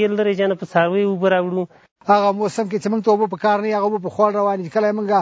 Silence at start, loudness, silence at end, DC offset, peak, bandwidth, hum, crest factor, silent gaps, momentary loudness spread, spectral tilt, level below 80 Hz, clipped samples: 0 s; -19 LUFS; 0 s; under 0.1%; 0 dBFS; 8 kHz; none; 18 dB; 1.91-1.96 s; 5 LU; -6.5 dB/octave; -68 dBFS; under 0.1%